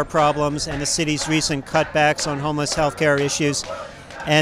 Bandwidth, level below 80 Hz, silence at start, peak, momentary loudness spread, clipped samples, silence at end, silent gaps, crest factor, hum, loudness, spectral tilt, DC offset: 15 kHz; -44 dBFS; 0 s; -4 dBFS; 8 LU; under 0.1%; 0 s; none; 18 dB; none; -20 LUFS; -3.5 dB/octave; under 0.1%